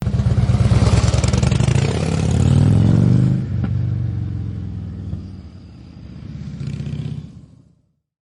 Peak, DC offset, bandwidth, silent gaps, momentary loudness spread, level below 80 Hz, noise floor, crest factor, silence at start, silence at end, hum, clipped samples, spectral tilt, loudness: -6 dBFS; under 0.1%; 11 kHz; none; 19 LU; -30 dBFS; -59 dBFS; 12 dB; 0 s; 0.9 s; none; under 0.1%; -7 dB/octave; -18 LUFS